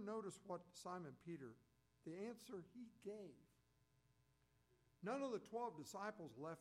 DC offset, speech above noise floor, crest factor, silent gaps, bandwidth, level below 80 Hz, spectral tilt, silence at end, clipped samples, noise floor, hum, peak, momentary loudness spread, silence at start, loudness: under 0.1%; 28 dB; 18 dB; none; 15 kHz; -88 dBFS; -5.5 dB/octave; 0 s; under 0.1%; -80 dBFS; none; -36 dBFS; 10 LU; 0 s; -53 LUFS